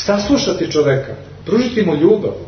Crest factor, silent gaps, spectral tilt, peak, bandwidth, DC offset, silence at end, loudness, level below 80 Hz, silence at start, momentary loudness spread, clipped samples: 16 dB; none; -5.5 dB/octave; 0 dBFS; 6.6 kHz; under 0.1%; 0 s; -15 LUFS; -42 dBFS; 0 s; 7 LU; under 0.1%